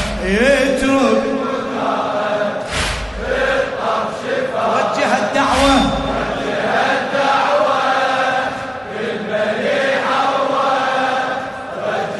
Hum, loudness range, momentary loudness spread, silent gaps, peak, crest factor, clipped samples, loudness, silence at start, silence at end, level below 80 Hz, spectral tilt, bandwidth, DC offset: none; 3 LU; 8 LU; none; -2 dBFS; 16 dB; under 0.1%; -17 LUFS; 0 s; 0 s; -36 dBFS; -4 dB/octave; 11.5 kHz; under 0.1%